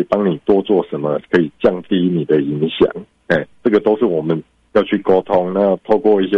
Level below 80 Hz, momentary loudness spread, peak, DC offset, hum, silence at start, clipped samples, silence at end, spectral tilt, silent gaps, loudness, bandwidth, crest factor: -50 dBFS; 5 LU; -2 dBFS; under 0.1%; none; 0 s; under 0.1%; 0 s; -8.5 dB/octave; none; -16 LUFS; 6 kHz; 14 dB